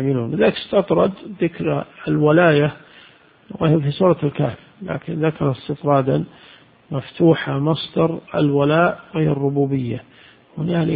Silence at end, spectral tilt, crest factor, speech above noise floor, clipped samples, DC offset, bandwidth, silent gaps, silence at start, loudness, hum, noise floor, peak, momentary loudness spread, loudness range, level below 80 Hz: 0 s; -12.5 dB/octave; 18 dB; 30 dB; under 0.1%; under 0.1%; 4.9 kHz; none; 0 s; -19 LUFS; none; -49 dBFS; 0 dBFS; 13 LU; 3 LU; -52 dBFS